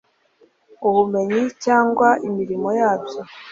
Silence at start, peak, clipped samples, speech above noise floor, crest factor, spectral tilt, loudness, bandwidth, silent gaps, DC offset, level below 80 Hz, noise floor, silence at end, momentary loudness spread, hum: 0.8 s; -2 dBFS; under 0.1%; 39 dB; 18 dB; -6 dB/octave; -19 LUFS; 7.6 kHz; none; under 0.1%; -64 dBFS; -58 dBFS; 0 s; 8 LU; none